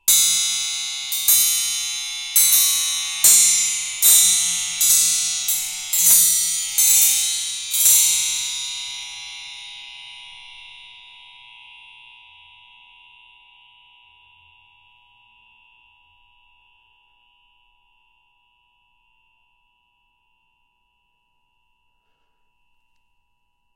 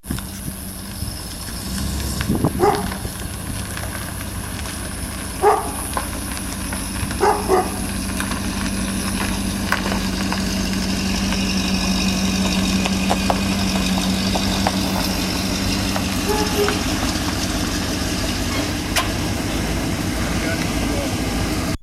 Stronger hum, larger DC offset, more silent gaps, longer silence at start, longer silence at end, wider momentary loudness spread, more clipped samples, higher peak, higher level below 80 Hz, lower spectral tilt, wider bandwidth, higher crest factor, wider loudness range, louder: neither; second, under 0.1% vs 0.1%; neither; about the same, 0.05 s vs 0 s; first, 12.85 s vs 0.05 s; first, 22 LU vs 8 LU; neither; first, 0 dBFS vs -4 dBFS; second, -62 dBFS vs -30 dBFS; second, 4 dB/octave vs -4 dB/octave; about the same, 16.5 kHz vs 16 kHz; about the same, 22 dB vs 18 dB; first, 19 LU vs 4 LU; first, -15 LUFS vs -21 LUFS